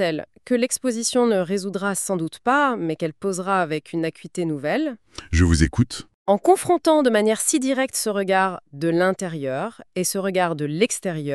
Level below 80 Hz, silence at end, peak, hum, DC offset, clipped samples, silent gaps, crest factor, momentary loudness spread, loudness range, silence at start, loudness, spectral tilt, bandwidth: -38 dBFS; 0 s; -4 dBFS; none; 0.1%; under 0.1%; 6.14-6.26 s; 18 dB; 9 LU; 4 LU; 0 s; -22 LUFS; -4.5 dB/octave; 13.5 kHz